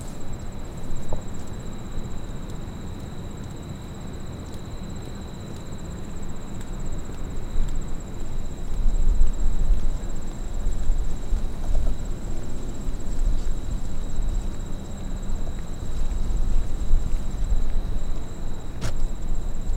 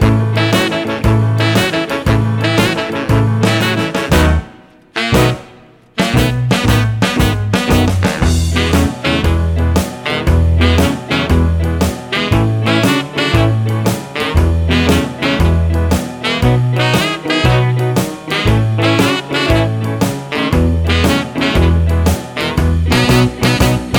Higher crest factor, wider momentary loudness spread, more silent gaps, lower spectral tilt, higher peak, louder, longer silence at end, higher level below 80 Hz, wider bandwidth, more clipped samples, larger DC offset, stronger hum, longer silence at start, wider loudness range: about the same, 16 dB vs 12 dB; first, 8 LU vs 5 LU; neither; about the same, -6 dB/octave vs -5.5 dB/octave; second, -6 dBFS vs 0 dBFS; second, -33 LUFS vs -14 LUFS; about the same, 0 s vs 0 s; about the same, -24 dBFS vs -22 dBFS; second, 8.2 kHz vs over 20 kHz; neither; neither; neither; about the same, 0 s vs 0 s; first, 6 LU vs 1 LU